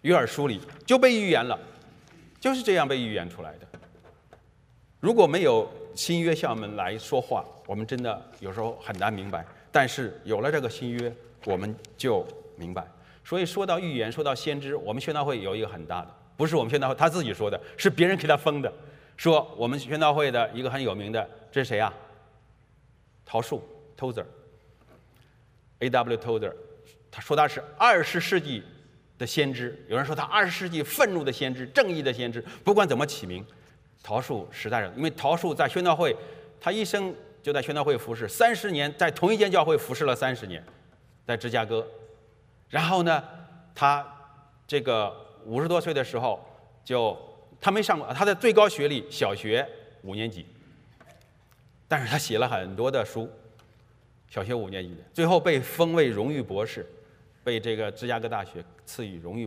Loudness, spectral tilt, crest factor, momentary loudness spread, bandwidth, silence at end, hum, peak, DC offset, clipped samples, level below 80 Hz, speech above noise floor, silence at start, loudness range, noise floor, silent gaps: -26 LUFS; -5 dB/octave; 22 dB; 14 LU; 16 kHz; 0 s; none; -4 dBFS; under 0.1%; under 0.1%; -64 dBFS; 34 dB; 0.05 s; 6 LU; -60 dBFS; none